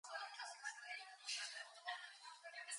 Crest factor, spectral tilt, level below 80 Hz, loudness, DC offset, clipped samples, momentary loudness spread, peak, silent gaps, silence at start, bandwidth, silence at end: 20 dB; 6 dB/octave; under -90 dBFS; -50 LUFS; under 0.1%; under 0.1%; 8 LU; -32 dBFS; none; 0.05 s; 11 kHz; 0 s